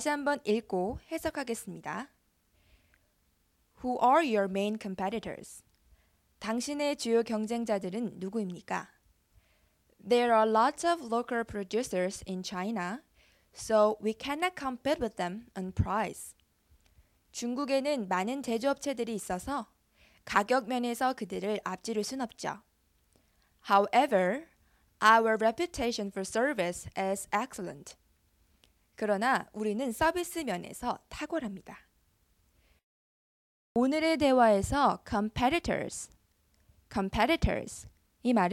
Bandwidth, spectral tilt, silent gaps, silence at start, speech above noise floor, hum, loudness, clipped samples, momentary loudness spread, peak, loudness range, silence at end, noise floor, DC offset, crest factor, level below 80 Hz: 16 kHz; -4.5 dB/octave; 32.83-33.75 s; 0 s; 42 dB; none; -31 LUFS; under 0.1%; 14 LU; -8 dBFS; 6 LU; 0 s; -72 dBFS; under 0.1%; 22 dB; -54 dBFS